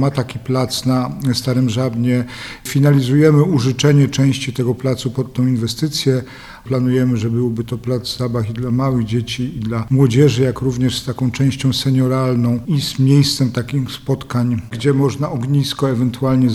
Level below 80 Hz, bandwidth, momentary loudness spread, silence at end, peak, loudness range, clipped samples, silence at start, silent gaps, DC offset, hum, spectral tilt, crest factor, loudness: -44 dBFS; 14 kHz; 9 LU; 0 s; 0 dBFS; 4 LU; under 0.1%; 0 s; none; under 0.1%; none; -6.5 dB/octave; 16 dB; -17 LUFS